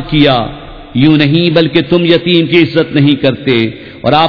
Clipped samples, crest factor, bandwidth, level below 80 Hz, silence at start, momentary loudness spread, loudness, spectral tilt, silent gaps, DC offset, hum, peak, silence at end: 1%; 10 dB; 5.4 kHz; -36 dBFS; 0 s; 9 LU; -10 LUFS; -8.5 dB/octave; none; 0.5%; none; 0 dBFS; 0 s